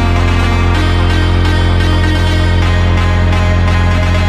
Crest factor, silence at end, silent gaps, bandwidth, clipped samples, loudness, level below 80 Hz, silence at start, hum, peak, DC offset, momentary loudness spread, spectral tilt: 8 dB; 0 s; none; 10 kHz; under 0.1%; -12 LUFS; -16 dBFS; 0 s; none; -2 dBFS; under 0.1%; 0 LU; -6.5 dB/octave